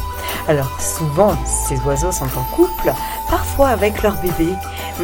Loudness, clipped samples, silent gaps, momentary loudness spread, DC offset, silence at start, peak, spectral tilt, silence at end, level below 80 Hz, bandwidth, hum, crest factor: -18 LUFS; under 0.1%; none; 6 LU; under 0.1%; 0 s; 0 dBFS; -5 dB/octave; 0 s; -28 dBFS; 17.5 kHz; none; 18 dB